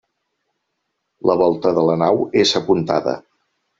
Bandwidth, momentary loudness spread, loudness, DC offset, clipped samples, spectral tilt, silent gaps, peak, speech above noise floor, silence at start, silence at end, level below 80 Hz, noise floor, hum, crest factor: 8 kHz; 6 LU; -17 LUFS; under 0.1%; under 0.1%; -4.5 dB/octave; none; -2 dBFS; 58 dB; 1.25 s; 0.6 s; -58 dBFS; -74 dBFS; none; 18 dB